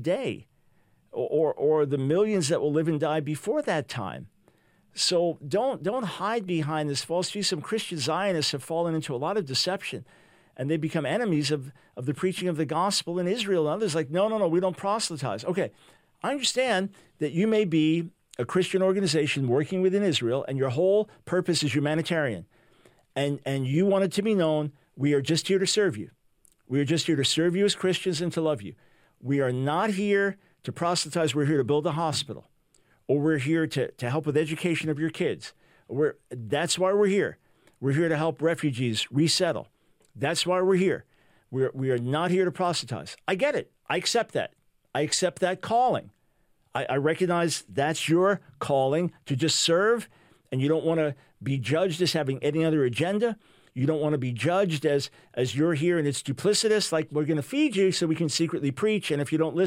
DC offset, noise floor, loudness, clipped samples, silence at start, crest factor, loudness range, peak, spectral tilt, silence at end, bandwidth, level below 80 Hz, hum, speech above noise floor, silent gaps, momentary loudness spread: under 0.1%; -67 dBFS; -26 LUFS; under 0.1%; 0 s; 18 dB; 3 LU; -10 dBFS; -5 dB/octave; 0 s; 16 kHz; -70 dBFS; none; 41 dB; none; 9 LU